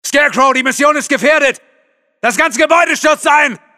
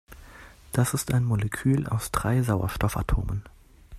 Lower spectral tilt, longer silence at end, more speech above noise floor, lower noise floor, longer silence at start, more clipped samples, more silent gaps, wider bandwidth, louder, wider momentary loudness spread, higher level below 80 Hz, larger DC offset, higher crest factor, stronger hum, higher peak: second, -2 dB/octave vs -6 dB/octave; first, 0.2 s vs 0 s; first, 45 dB vs 23 dB; first, -57 dBFS vs -48 dBFS; about the same, 0.05 s vs 0.1 s; neither; neither; about the same, 15.5 kHz vs 15 kHz; first, -11 LUFS vs -26 LUFS; about the same, 5 LU vs 6 LU; second, -54 dBFS vs -38 dBFS; first, 0.2% vs under 0.1%; second, 12 dB vs 18 dB; neither; first, 0 dBFS vs -10 dBFS